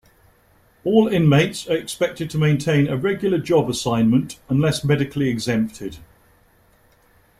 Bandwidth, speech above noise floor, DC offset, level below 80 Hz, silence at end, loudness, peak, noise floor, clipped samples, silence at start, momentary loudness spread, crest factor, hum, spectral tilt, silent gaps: 15 kHz; 38 dB; under 0.1%; -50 dBFS; 1.35 s; -20 LUFS; -2 dBFS; -57 dBFS; under 0.1%; 0.85 s; 8 LU; 18 dB; none; -6.5 dB/octave; none